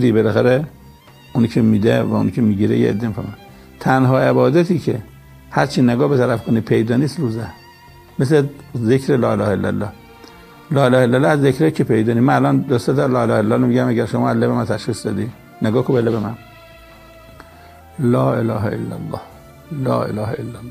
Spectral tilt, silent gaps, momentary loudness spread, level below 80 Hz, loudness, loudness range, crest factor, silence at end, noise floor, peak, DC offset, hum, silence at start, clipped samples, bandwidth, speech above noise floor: -7.5 dB/octave; none; 12 LU; -50 dBFS; -17 LUFS; 6 LU; 18 dB; 0 s; -43 dBFS; 0 dBFS; under 0.1%; none; 0 s; under 0.1%; 15.5 kHz; 27 dB